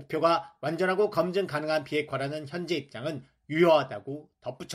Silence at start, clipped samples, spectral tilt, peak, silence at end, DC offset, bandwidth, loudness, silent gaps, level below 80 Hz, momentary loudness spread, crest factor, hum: 0 s; under 0.1%; -6 dB/octave; -10 dBFS; 0 s; under 0.1%; 14.5 kHz; -28 LUFS; none; -70 dBFS; 16 LU; 18 dB; none